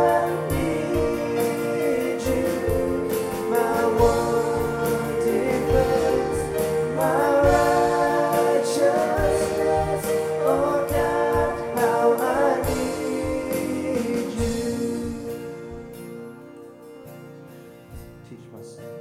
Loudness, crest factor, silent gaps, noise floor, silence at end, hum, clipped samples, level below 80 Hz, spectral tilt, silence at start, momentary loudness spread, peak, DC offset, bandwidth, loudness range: -22 LUFS; 16 dB; none; -43 dBFS; 0 s; none; under 0.1%; -40 dBFS; -5.5 dB/octave; 0 s; 22 LU; -6 dBFS; under 0.1%; 16.5 kHz; 11 LU